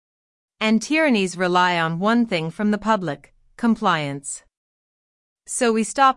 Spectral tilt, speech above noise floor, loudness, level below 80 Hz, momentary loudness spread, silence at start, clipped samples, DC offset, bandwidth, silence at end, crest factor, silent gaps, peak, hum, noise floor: -4.5 dB/octave; over 70 dB; -21 LUFS; -58 dBFS; 12 LU; 0.6 s; under 0.1%; under 0.1%; 12 kHz; 0.05 s; 18 dB; 4.57-5.36 s; -4 dBFS; none; under -90 dBFS